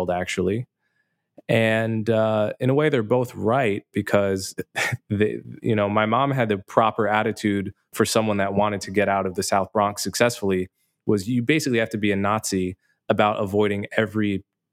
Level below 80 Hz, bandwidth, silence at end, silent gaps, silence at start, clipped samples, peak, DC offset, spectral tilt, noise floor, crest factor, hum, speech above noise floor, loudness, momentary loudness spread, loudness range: -60 dBFS; 16.5 kHz; 0.3 s; none; 0 s; under 0.1%; -2 dBFS; under 0.1%; -5.5 dB/octave; -73 dBFS; 20 dB; none; 50 dB; -23 LUFS; 7 LU; 1 LU